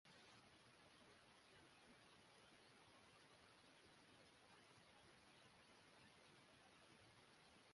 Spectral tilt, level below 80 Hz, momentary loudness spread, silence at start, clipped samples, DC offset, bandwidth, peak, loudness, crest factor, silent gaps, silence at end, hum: -3 dB/octave; -90 dBFS; 1 LU; 0.05 s; under 0.1%; under 0.1%; 11.5 kHz; -56 dBFS; -69 LUFS; 16 dB; none; 0 s; none